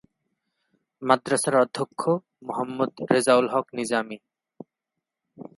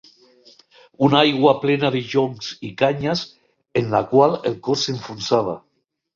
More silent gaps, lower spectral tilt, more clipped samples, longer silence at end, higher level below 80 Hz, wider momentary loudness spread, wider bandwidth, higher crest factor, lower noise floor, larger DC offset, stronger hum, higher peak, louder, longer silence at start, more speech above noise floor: neither; about the same, -4.5 dB/octave vs -5.5 dB/octave; neither; second, 0.1 s vs 0.55 s; second, -74 dBFS vs -58 dBFS; about the same, 13 LU vs 12 LU; first, 11.5 kHz vs 7.6 kHz; about the same, 22 dB vs 18 dB; first, -85 dBFS vs -52 dBFS; neither; neither; about the same, -4 dBFS vs -2 dBFS; second, -24 LUFS vs -20 LUFS; about the same, 1 s vs 1 s; first, 61 dB vs 33 dB